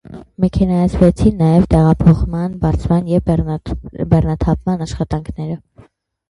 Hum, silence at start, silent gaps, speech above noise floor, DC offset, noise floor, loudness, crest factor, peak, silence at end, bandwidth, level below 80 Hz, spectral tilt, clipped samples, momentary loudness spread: none; 0.1 s; none; 33 dB; under 0.1%; -47 dBFS; -15 LUFS; 14 dB; 0 dBFS; 0.7 s; 10.5 kHz; -26 dBFS; -9 dB/octave; under 0.1%; 13 LU